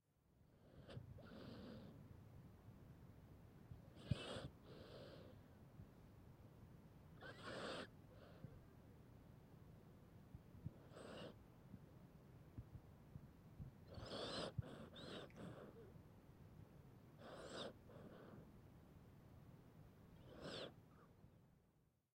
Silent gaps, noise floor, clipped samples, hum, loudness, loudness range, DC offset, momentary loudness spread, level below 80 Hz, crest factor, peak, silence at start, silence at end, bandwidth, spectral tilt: none; -80 dBFS; under 0.1%; none; -58 LUFS; 7 LU; under 0.1%; 15 LU; -72 dBFS; 30 dB; -28 dBFS; 0.1 s; 0.25 s; 16 kHz; -5.5 dB/octave